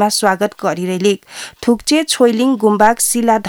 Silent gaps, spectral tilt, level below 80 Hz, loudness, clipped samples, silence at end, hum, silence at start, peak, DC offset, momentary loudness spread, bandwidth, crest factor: none; -3.5 dB/octave; -50 dBFS; -14 LUFS; under 0.1%; 0 s; none; 0 s; 0 dBFS; under 0.1%; 8 LU; 19.5 kHz; 14 dB